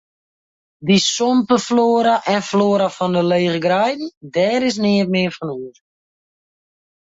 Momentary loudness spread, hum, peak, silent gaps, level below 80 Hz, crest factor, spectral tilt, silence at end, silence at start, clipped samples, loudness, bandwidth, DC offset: 12 LU; none; -4 dBFS; 4.17-4.21 s; -60 dBFS; 16 dB; -5 dB/octave; 1.35 s; 0.8 s; under 0.1%; -17 LUFS; 8 kHz; under 0.1%